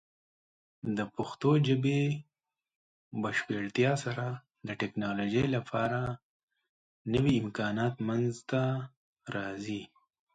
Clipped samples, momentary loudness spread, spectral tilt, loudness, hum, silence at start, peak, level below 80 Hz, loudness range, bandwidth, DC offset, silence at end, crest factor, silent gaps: under 0.1%; 13 LU; -7 dB/octave; -32 LUFS; none; 0.85 s; -14 dBFS; -62 dBFS; 3 LU; 9.2 kHz; under 0.1%; 0.5 s; 18 dB; 2.76-3.11 s, 6.23-6.48 s, 6.69-7.05 s, 8.97-9.13 s